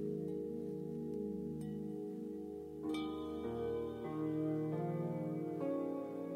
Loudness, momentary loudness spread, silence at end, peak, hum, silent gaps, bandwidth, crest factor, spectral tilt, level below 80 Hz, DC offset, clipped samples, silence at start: -42 LUFS; 6 LU; 0 s; -28 dBFS; none; none; 15.5 kHz; 14 dB; -8.5 dB/octave; -66 dBFS; under 0.1%; under 0.1%; 0 s